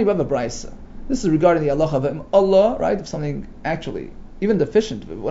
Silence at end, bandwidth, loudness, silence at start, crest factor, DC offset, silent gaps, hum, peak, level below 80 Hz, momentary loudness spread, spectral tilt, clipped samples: 0 s; 7.8 kHz; -20 LUFS; 0 s; 16 dB; under 0.1%; none; none; -2 dBFS; -38 dBFS; 13 LU; -6.5 dB/octave; under 0.1%